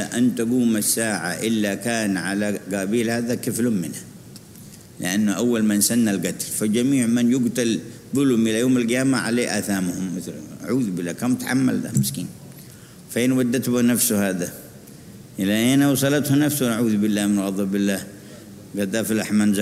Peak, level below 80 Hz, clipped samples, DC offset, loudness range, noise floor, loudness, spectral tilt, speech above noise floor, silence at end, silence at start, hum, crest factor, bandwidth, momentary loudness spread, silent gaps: -6 dBFS; -60 dBFS; under 0.1%; under 0.1%; 4 LU; -43 dBFS; -21 LUFS; -4.5 dB/octave; 22 dB; 0 s; 0 s; none; 16 dB; 16 kHz; 16 LU; none